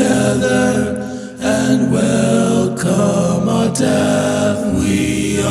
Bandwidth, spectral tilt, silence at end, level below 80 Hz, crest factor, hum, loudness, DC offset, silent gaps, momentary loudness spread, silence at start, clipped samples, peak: 14 kHz; -5.5 dB/octave; 0 s; -42 dBFS; 12 dB; none; -15 LUFS; under 0.1%; none; 4 LU; 0 s; under 0.1%; -2 dBFS